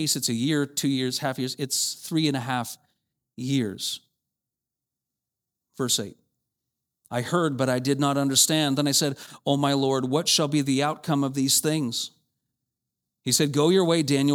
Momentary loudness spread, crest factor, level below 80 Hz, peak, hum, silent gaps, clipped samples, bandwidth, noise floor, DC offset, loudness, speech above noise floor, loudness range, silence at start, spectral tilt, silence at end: 11 LU; 20 dB; -72 dBFS; -6 dBFS; none; none; under 0.1%; 19 kHz; -87 dBFS; under 0.1%; -24 LUFS; 63 dB; 10 LU; 0 s; -4 dB/octave; 0 s